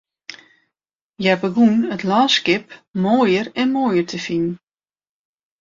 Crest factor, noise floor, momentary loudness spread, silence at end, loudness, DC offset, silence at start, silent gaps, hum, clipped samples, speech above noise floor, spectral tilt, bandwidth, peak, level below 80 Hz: 18 dB; under -90 dBFS; 15 LU; 1.05 s; -18 LUFS; under 0.1%; 0.3 s; 1.01-1.13 s, 2.90-2.94 s; none; under 0.1%; over 72 dB; -5 dB/octave; 7.6 kHz; -2 dBFS; -62 dBFS